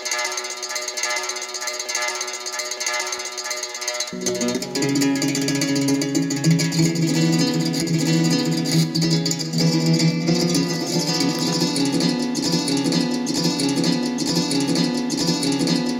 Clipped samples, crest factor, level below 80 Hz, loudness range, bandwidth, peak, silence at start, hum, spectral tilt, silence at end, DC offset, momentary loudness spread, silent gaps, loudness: under 0.1%; 14 dB; -58 dBFS; 5 LU; 16.5 kHz; -6 dBFS; 0 s; none; -4 dB/octave; 0 s; under 0.1%; 6 LU; none; -21 LUFS